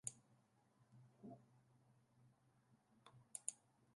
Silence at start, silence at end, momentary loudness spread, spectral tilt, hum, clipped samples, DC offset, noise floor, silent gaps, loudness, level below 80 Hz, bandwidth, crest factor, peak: 0.05 s; 0 s; 19 LU; -3 dB/octave; none; under 0.1%; under 0.1%; -77 dBFS; none; -54 LUFS; under -90 dBFS; 11 kHz; 38 dB; -24 dBFS